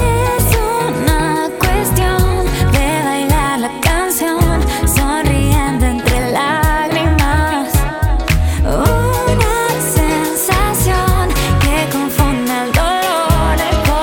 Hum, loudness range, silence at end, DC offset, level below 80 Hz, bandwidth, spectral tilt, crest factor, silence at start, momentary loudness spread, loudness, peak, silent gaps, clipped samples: none; 1 LU; 0 s; under 0.1%; -18 dBFS; 19.5 kHz; -5 dB/octave; 12 dB; 0 s; 2 LU; -14 LUFS; 0 dBFS; none; under 0.1%